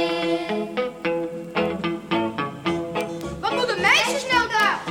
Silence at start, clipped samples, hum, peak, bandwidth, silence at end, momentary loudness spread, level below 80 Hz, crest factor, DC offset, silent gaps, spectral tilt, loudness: 0 s; under 0.1%; none; -4 dBFS; 17.5 kHz; 0 s; 10 LU; -52 dBFS; 18 dB; under 0.1%; none; -3.5 dB/octave; -23 LUFS